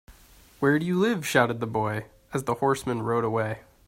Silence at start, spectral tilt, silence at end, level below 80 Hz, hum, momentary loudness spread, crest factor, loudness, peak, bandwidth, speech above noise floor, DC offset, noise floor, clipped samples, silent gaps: 0.1 s; -6 dB/octave; 0.3 s; -58 dBFS; none; 9 LU; 20 dB; -26 LUFS; -8 dBFS; 16 kHz; 28 dB; under 0.1%; -53 dBFS; under 0.1%; none